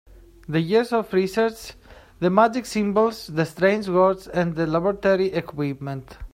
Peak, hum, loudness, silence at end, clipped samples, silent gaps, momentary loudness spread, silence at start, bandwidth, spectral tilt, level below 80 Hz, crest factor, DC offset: -2 dBFS; none; -22 LUFS; 0.05 s; under 0.1%; none; 9 LU; 0.5 s; 16 kHz; -6.5 dB/octave; -50 dBFS; 20 dB; under 0.1%